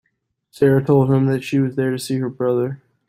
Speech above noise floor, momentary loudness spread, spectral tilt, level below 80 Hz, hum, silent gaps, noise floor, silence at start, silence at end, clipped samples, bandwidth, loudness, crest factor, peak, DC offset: 54 dB; 7 LU; -7.5 dB/octave; -56 dBFS; none; none; -71 dBFS; 0.6 s; 0.35 s; under 0.1%; 15.5 kHz; -19 LUFS; 16 dB; -4 dBFS; under 0.1%